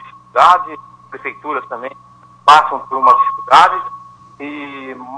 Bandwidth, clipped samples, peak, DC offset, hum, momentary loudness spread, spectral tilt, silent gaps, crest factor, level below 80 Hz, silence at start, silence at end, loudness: 11 kHz; 0.3%; 0 dBFS; under 0.1%; none; 20 LU; -2.5 dB/octave; none; 14 dB; -58 dBFS; 0.05 s; 0 s; -12 LUFS